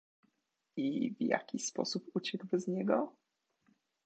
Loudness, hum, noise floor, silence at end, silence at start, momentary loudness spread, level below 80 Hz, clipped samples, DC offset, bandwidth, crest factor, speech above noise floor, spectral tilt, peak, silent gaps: -36 LUFS; none; -82 dBFS; 0.95 s; 0.75 s; 5 LU; -88 dBFS; under 0.1%; under 0.1%; 8.8 kHz; 22 dB; 47 dB; -4.5 dB/octave; -14 dBFS; none